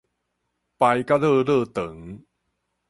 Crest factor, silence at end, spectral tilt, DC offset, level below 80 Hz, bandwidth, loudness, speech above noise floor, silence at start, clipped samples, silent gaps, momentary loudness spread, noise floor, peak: 18 dB; 0.75 s; -7 dB/octave; under 0.1%; -58 dBFS; 11.5 kHz; -21 LUFS; 55 dB; 0.8 s; under 0.1%; none; 18 LU; -76 dBFS; -6 dBFS